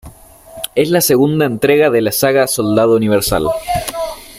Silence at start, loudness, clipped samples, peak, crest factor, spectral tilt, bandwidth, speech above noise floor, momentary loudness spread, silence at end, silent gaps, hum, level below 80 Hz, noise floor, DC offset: 0.05 s; -13 LUFS; under 0.1%; -2 dBFS; 12 dB; -4.5 dB/octave; 16 kHz; 25 dB; 8 LU; 0 s; none; none; -38 dBFS; -38 dBFS; under 0.1%